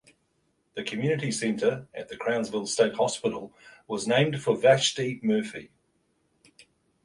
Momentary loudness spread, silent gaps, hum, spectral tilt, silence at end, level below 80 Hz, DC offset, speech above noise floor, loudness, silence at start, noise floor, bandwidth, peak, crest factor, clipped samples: 16 LU; none; none; -4.5 dB/octave; 1.4 s; -68 dBFS; under 0.1%; 45 dB; -26 LUFS; 0.75 s; -72 dBFS; 11.5 kHz; -6 dBFS; 22 dB; under 0.1%